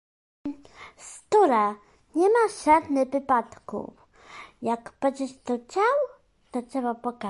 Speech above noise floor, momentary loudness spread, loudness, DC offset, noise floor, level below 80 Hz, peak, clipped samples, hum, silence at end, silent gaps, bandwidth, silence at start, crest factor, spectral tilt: 23 dB; 22 LU; -25 LUFS; under 0.1%; -47 dBFS; -62 dBFS; -8 dBFS; under 0.1%; none; 0 s; none; 11.5 kHz; 0.45 s; 18 dB; -4.5 dB/octave